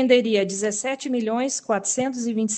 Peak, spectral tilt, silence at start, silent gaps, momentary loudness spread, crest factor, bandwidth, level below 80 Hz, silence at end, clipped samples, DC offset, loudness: -4 dBFS; -3 dB/octave; 0 s; none; 7 LU; 18 dB; 9.4 kHz; -70 dBFS; 0 s; under 0.1%; under 0.1%; -23 LUFS